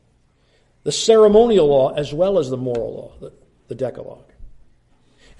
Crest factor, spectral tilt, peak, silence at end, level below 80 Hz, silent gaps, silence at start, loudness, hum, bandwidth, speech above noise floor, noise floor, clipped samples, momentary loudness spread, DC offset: 18 dB; -5 dB/octave; -2 dBFS; 0.9 s; -48 dBFS; none; 0.85 s; -17 LUFS; none; 11.5 kHz; 42 dB; -59 dBFS; under 0.1%; 24 LU; under 0.1%